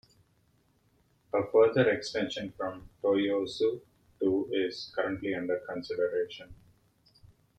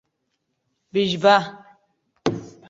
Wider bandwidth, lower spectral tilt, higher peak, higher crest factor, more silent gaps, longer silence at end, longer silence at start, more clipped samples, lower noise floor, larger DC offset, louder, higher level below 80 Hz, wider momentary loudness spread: first, 9 kHz vs 7.8 kHz; about the same, -5.5 dB/octave vs -5 dB/octave; second, -12 dBFS vs -2 dBFS; about the same, 20 dB vs 22 dB; neither; about the same, 0.3 s vs 0.2 s; first, 1.35 s vs 0.95 s; neither; second, -69 dBFS vs -75 dBFS; neither; second, -30 LUFS vs -21 LUFS; about the same, -64 dBFS vs -62 dBFS; about the same, 13 LU vs 11 LU